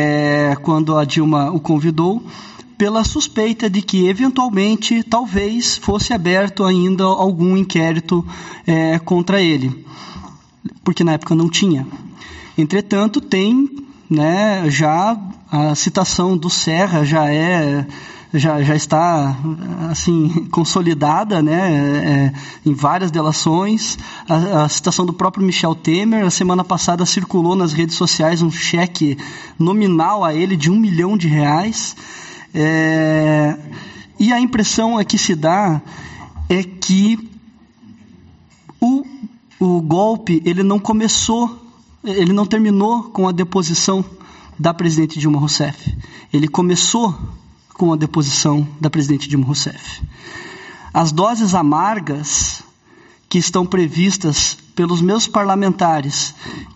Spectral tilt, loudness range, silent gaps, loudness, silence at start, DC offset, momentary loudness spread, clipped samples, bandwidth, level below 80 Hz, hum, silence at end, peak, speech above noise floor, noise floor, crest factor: -5 dB/octave; 2 LU; none; -16 LUFS; 0 s; under 0.1%; 11 LU; under 0.1%; 8.2 kHz; -42 dBFS; none; 0.05 s; -2 dBFS; 32 dB; -48 dBFS; 12 dB